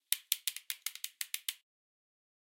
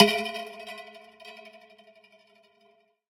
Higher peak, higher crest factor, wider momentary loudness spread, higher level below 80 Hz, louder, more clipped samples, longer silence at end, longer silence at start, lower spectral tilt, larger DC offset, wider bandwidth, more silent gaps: second, -8 dBFS vs -2 dBFS; first, 34 dB vs 28 dB; second, 8 LU vs 22 LU; second, under -90 dBFS vs -72 dBFS; second, -37 LUFS vs -29 LUFS; neither; second, 1.05 s vs 1.7 s; about the same, 0.1 s vs 0 s; second, 9 dB/octave vs -4 dB/octave; neither; about the same, 17 kHz vs 16.5 kHz; neither